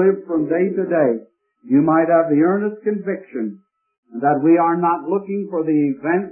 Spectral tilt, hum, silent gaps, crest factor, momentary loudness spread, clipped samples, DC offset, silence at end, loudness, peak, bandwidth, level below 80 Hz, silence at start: -14.5 dB/octave; none; 3.98-4.03 s; 14 dB; 11 LU; under 0.1%; under 0.1%; 0 s; -18 LUFS; -4 dBFS; 2.9 kHz; -70 dBFS; 0 s